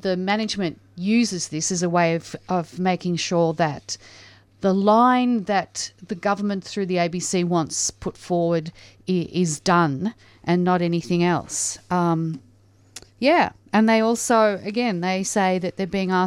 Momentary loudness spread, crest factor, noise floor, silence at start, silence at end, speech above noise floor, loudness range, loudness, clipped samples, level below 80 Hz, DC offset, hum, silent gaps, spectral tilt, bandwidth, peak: 10 LU; 16 dB; -54 dBFS; 0.05 s; 0 s; 33 dB; 3 LU; -22 LUFS; under 0.1%; -58 dBFS; under 0.1%; none; none; -5 dB/octave; 13.5 kHz; -4 dBFS